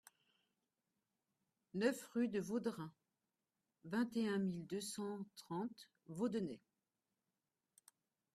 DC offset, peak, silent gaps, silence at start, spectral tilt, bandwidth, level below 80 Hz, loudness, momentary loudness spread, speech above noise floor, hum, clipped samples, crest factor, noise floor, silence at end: under 0.1%; -24 dBFS; none; 1.75 s; -5.5 dB/octave; 14 kHz; -84 dBFS; -43 LUFS; 14 LU; over 48 dB; none; under 0.1%; 22 dB; under -90 dBFS; 1.75 s